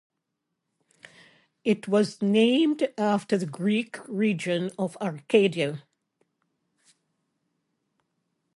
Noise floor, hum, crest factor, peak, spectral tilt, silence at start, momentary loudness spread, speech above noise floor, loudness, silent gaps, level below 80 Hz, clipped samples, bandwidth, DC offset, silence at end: -82 dBFS; none; 22 dB; -6 dBFS; -6 dB/octave; 1.65 s; 9 LU; 57 dB; -25 LUFS; none; -76 dBFS; under 0.1%; 11.5 kHz; under 0.1%; 2.75 s